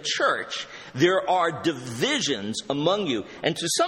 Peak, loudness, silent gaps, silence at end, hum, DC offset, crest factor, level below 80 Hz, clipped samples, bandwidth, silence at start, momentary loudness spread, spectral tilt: -6 dBFS; -25 LUFS; none; 0 s; none; under 0.1%; 18 dB; -64 dBFS; under 0.1%; 16 kHz; 0 s; 7 LU; -3.5 dB/octave